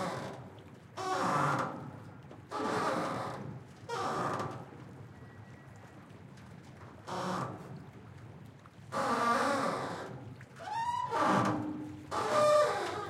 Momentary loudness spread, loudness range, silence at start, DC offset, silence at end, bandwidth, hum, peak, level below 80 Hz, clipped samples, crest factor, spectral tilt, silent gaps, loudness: 23 LU; 11 LU; 0 s; under 0.1%; 0 s; 16 kHz; none; -16 dBFS; -72 dBFS; under 0.1%; 20 dB; -5 dB/octave; none; -33 LUFS